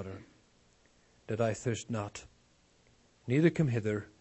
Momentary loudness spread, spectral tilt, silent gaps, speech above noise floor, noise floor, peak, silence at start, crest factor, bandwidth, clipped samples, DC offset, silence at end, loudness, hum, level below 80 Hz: 20 LU; -6.5 dB/octave; none; 35 dB; -67 dBFS; -12 dBFS; 0 s; 22 dB; 8.4 kHz; under 0.1%; under 0.1%; 0.15 s; -32 LUFS; none; -66 dBFS